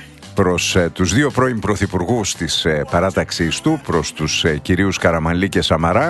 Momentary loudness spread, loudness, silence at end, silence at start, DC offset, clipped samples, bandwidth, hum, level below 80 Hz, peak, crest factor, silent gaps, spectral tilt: 4 LU; -17 LUFS; 0 s; 0 s; under 0.1%; under 0.1%; 12.5 kHz; none; -36 dBFS; 0 dBFS; 16 dB; none; -4.5 dB/octave